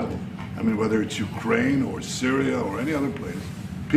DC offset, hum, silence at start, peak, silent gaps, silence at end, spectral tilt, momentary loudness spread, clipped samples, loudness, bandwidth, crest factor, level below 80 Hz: under 0.1%; none; 0 s; -6 dBFS; none; 0 s; -5.5 dB/octave; 11 LU; under 0.1%; -26 LUFS; 15 kHz; 18 dB; -52 dBFS